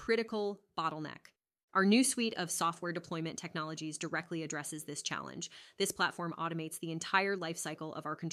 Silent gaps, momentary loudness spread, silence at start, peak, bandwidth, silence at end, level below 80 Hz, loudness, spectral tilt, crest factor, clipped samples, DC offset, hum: 1.63-1.68 s; 10 LU; 0 s; -14 dBFS; 15.5 kHz; 0 s; -76 dBFS; -35 LUFS; -3.5 dB/octave; 22 dB; under 0.1%; under 0.1%; none